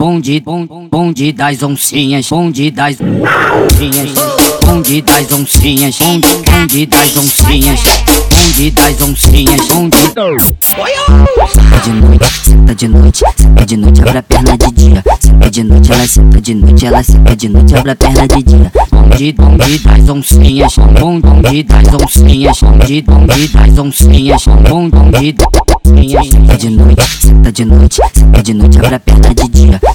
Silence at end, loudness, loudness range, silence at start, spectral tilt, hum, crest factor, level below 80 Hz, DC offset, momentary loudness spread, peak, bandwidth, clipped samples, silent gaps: 0 s; -7 LUFS; 2 LU; 0 s; -5 dB/octave; none; 4 dB; -6 dBFS; under 0.1%; 4 LU; 0 dBFS; over 20 kHz; 10%; none